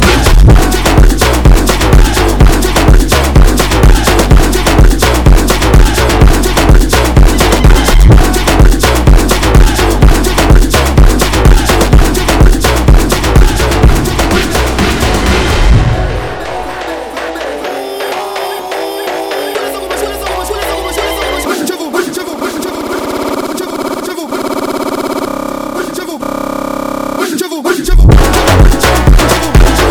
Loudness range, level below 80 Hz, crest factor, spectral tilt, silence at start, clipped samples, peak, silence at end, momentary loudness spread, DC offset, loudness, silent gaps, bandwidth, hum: 8 LU; -10 dBFS; 8 dB; -5 dB/octave; 0 s; 3%; 0 dBFS; 0 s; 10 LU; under 0.1%; -10 LUFS; none; 19.5 kHz; none